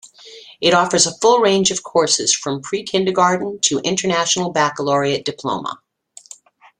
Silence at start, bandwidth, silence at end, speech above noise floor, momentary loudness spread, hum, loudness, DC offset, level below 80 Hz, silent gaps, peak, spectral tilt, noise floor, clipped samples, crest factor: 0.05 s; 11 kHz; 1.05 s; 27 dB; 10 LU; none; -17 LUFS; under 0.1%; -60 dBFS; none; -2 dBFS; -2.5 dB/octave; -44 dBFS; under 0.1%; 16 dB